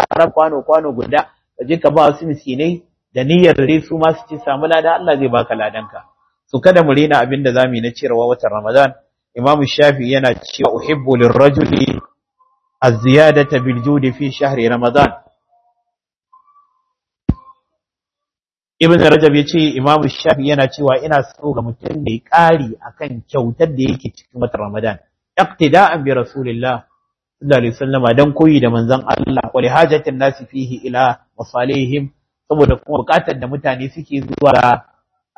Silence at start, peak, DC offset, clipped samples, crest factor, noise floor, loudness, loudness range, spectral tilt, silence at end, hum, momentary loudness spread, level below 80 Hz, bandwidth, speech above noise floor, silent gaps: 0 s; 0 dBFS; under 0.1%; 0.4%; 14 dB; under -90 dBFS; -14 LUFS; 4 LU; -7 dB/octave; 0.55 s; none; 13 LU; -42 dBFS; 12 kHz; over 77 dB; none